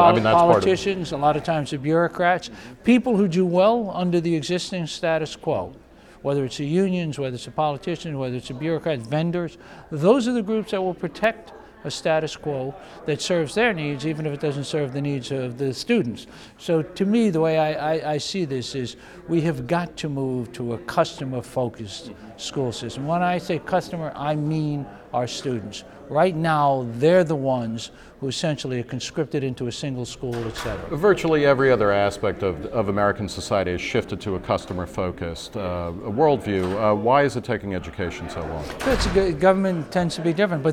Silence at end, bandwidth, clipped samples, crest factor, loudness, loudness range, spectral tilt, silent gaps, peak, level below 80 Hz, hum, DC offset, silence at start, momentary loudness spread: 0 s; 15 kHz; under 0.1%; 22 dB; -23 LUFS; 5 LU; -6 dB/octave; none; -2 dBFS; -46 dBFS; none; under 0.1%; 0 s; 12 LU